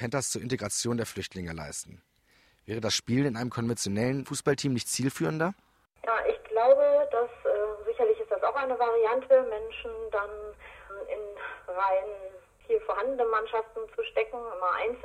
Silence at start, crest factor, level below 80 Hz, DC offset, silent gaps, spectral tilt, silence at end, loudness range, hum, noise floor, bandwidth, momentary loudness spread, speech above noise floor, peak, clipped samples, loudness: 0 s; 20 dB; -60 dBFS; under 0.1%; none; -4.5 dB/octave; 0 s; 6 LU; none; -65 dBFS; 15.5 kHz; 14 LU; 36 dB; -10 dBFS; under 0.1%; -29 LUFS